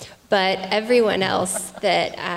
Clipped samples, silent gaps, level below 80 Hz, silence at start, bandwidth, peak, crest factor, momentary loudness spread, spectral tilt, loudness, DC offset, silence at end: under 0.1%; none; -58 dBFS; 0 s; 16 kHz; -6 dBFS; 14 dB; 5 LU; -3 dB/octave; -20 LUFS; under 0.1%; 0 s